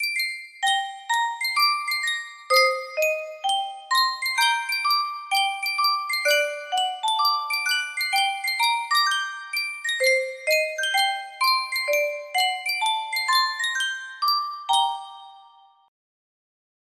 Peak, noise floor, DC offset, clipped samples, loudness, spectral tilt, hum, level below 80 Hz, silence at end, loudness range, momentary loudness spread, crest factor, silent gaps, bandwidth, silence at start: -6 dBFS; -53 dBFS; under 0.1%; under 0.1%; -22 LUFS; 3.5 dB/octave; none; -78 dBFS; 1.45 s; 2 LU; 5 LU; 18 dB; none; 16 kHz; 0 s